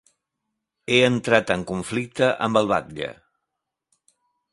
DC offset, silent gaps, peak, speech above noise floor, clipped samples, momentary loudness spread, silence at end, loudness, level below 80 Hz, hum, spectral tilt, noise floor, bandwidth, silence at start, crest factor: under 0.1%; none; 0 dBFS; 61 dB; under 0.1%; 14 LU; 1.4 s; -22 LUFS; -56 dBFS; none; -5 dB/octave; -82 dBFS; 11.5 kHz; 0.9 s; 24 dB